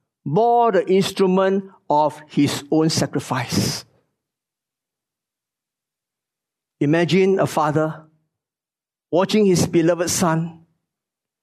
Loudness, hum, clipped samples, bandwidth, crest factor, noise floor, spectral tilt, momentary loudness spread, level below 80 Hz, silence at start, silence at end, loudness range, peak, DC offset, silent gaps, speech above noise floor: -19 LUFS; none; under 0.1%; 13.5 kHz; 16 dB; under -90 dBFS; -5 dB/octave; 8 LU; -56 dBFS; 0.25 s; 0.9 s; 9 LU; -6 dBFS; under 0.1%; none; over 72 dB